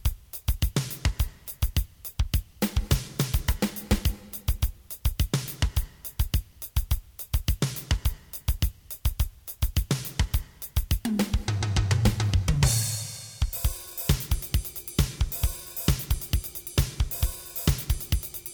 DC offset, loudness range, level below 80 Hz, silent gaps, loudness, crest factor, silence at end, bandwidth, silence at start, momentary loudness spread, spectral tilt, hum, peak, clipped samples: under 0.1%; 4 LU; -30 dBFS; none; -29 LUFS; 20 dB; 0 s; over 20 kHz; 0 s; 7 LU; -4.5 dB/octave; none; -8 dBFS; under 0.1%